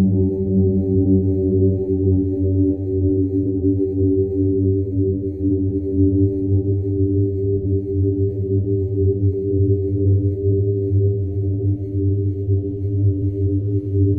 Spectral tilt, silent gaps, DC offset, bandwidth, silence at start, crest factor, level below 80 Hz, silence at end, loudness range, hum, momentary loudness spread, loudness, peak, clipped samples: -15.5 dB/octave; none; under 0.1%; 0.9 kHz; 0 s; 12 dB; -40 dBFS; 0 s; 2 LU; none; 4 LU; -19 LUFS; -6 dBFS; under 0.1%